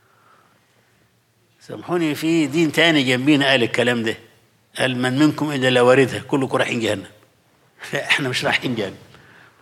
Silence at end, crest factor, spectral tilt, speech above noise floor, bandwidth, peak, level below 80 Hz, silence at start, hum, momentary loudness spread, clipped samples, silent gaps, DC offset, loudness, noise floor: 0.65 s; 18 dB; -5 dB/octave; 42 dB; 15.5 kHz; -2 dBFS; -68 dBFS; 1.7 s; none; 13 LU; under 0.1%; none; under 0.1%; -18 LUFS; -61 dBFS